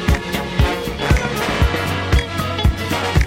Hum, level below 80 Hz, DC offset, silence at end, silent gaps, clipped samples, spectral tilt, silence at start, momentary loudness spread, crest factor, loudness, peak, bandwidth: none; -22 dBFS; under 0.1%; 0 s; none; under 0.1%; -5.5 dB/octave; 0 s; 3 LU; 16 dB; -19 LUFS; -2 dBFS; 16.5 kHz